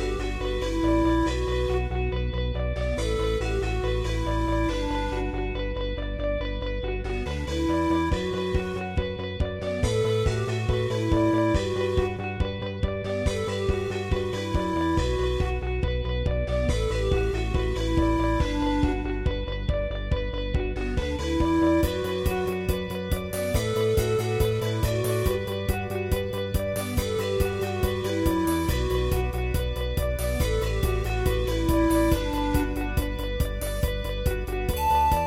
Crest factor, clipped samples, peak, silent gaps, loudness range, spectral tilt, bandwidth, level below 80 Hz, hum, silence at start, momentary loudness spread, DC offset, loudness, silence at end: 14 dB; under 0.1%; -10 dBFS; none; 2 LU; -6 dB/octave; 16.5 kHz; -30 dBFS; none; 0 s; 6 LU; under 0.1%; -27 LUFS; 0 s